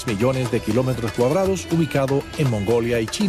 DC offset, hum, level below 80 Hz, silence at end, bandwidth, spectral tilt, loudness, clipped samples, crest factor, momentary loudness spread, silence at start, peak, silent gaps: under 0.1%; none; -42 dBFS; 0 s; 14.5 kHz; -6 dB/octave; -21 LUFS; under 0.1%; 14 dB; 3 LU; 0 s; -6 dBFS; none